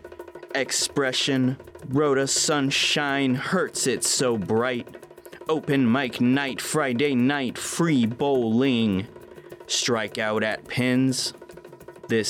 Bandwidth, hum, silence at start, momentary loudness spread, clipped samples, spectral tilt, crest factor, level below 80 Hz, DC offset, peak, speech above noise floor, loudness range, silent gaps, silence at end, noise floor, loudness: 16.5 kHz; none; 0.05 s; 9 LU; under 0.1%; -4 dB/octave; 12 dB; -64 dBFS; under 0.1%; -12 dBFS; 21 dB; 2 LU; none; 0 s; -44 dBFS; -23 LUFS